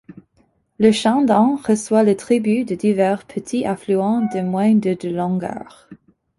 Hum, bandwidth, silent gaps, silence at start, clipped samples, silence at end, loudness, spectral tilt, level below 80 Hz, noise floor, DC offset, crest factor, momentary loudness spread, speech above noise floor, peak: none; 11.5 kHz; none; 0.1 s; under 0.1%; 0.45 s; -18 LUFS; -6 dB/octave; -58 dBFS; -61 dBFS; under 0.1%; 16 dB; 8 LU; 44 dB; -2 dBFS